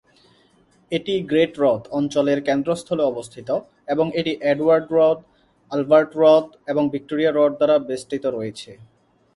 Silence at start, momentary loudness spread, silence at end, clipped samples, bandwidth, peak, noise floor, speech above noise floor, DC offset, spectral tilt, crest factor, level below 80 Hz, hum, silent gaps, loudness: 0.9 s; 11 LU; 0.6 s; under 0.1%; 11.5 kHz; -2 dBFS; -58 dBFS; 38 dB; under 0.1%; -6 dB/octave; 18 dB; -62 dBFS; none; none; -20 LUFS